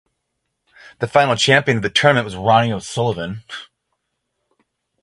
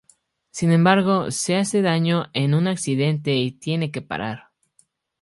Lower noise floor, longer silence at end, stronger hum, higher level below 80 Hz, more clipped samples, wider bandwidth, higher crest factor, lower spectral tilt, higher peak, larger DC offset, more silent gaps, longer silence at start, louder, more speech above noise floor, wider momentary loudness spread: first, -75 dBFS vs -63 dBFS; first, 1.4 s vs 0.8 s; neither; first, -52 dBFS vs -60 dBFS; neither; about the same, 11.5 kHz vs 11.5 kHz; about the same, 20 dB vs 20 dB; about the same, -4.5 dB/octave vs -5.5 dB/octave; about the same, 0 dBFS vs 0 dBFS; neither; neither; first, 1 s vs 0.55 s; first, -16 LUFS vs -21 LUFS; first, 58 dB vs 43 dB; first, 15 LU vs 12 LU